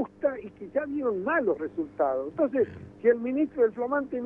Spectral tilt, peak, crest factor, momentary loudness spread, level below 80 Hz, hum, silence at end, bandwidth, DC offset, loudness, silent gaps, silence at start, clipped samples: -9.5 dB/octave; -10 dBFS; 16 dB; 6 LU; -62 dBFS; none; 0 s; 3.5 kHz; under 0.1%; -28 LUFS; none; 0 s; under 0.1%